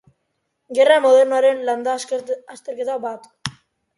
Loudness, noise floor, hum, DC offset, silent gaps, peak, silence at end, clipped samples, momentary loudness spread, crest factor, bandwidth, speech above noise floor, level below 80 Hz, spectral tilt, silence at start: -18 LUFS; -73 dBFS; none; under 0.1%; none; -2 dBFS; 0.45 s; under 0.1%; 18 LU; 18 dB; 11.5 kHz; 55 dB; -64 dBFS; -3.5 dB/octave; 0.7 s